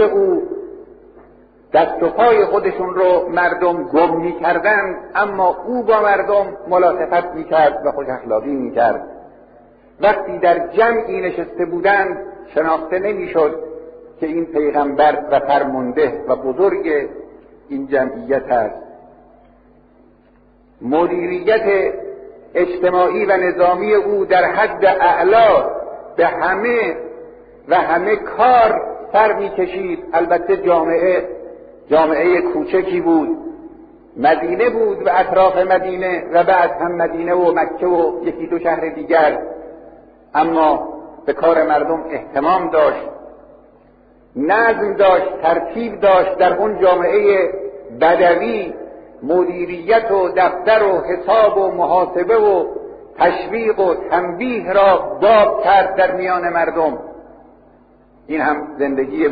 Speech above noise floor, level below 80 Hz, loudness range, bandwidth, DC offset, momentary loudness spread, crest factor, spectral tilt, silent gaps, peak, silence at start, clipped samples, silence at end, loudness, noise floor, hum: 35 dB; -50 dBFS; 4 LU; 5 kHz; under 0.1%; 11 LU; 16 dB; -3.5 dB/octave; none; 0 dBFS; 0 s; under 0.1%; 0 s; -16 LUFS; -50 dBFS; none